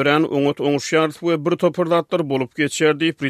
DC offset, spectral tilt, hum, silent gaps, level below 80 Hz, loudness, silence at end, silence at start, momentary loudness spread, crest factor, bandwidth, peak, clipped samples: under 0.1%; -5 dB/octave; none; none; -64 dBFS; -19 LUFS; 0 s; 0 s; 4 LU; 16 dB; 14.5 kHz; -2 dBFS; under 0.1%